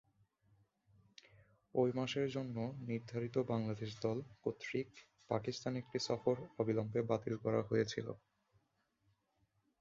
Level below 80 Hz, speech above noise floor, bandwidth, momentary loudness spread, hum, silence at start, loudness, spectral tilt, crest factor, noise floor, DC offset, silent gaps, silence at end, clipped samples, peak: -74 dBFS; 42 dB; 7.6 kHz; 7 LU; none; 1.75 s; -40 LUFS; -6 dB/octave; 20 dB; -81 dBFS; under 0.1%; none; 1.65 s; under 0.1%; -20 dBFS